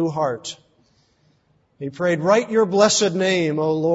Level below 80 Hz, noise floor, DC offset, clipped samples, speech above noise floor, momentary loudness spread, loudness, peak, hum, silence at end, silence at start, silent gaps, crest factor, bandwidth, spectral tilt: -64 dBFS; -62 dBFS; under 0.1%; under 0.1%; 43 dB; 18 LU; -19 LUFS; -2 dBFS; none; 0 s; 0 s; none; 18 dB; 8 kHz; -4 dB/octave